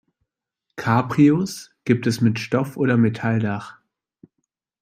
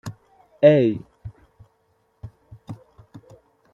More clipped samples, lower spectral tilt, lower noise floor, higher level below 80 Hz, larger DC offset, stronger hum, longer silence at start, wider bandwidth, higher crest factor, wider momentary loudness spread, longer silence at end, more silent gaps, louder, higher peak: neither; second, -7 dB/octave vs -8.5 dB/octave; first, -80 dBFS vs -66 dBFS; about the same, -60 dBFS vs -58 dBFS; neither; neither; first, 0.75 s vs 0.05 s; first, 15 kHz vs 7.2 kHz; about the same, 18 dB vs 22 dB; second, 14 LU vs 29 LU; about the same, 1.1 s vs 1 s; neither; second, -21 LUFS vs -18 LUFS; about the same, -4 dBFS vs -2 dBFS